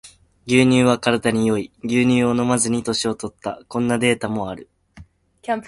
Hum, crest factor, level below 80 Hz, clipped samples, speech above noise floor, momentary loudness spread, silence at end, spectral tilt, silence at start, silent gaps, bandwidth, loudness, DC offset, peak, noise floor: none; 20 dB; -52 dBFS; under 0.1%; 28 dB; 14 LU; 0 s; -5 dB/octave; 0.05 s; none; 11.5 kHz; -19 LUFS; under 0.1%; 0 dBFS; -47 dBFS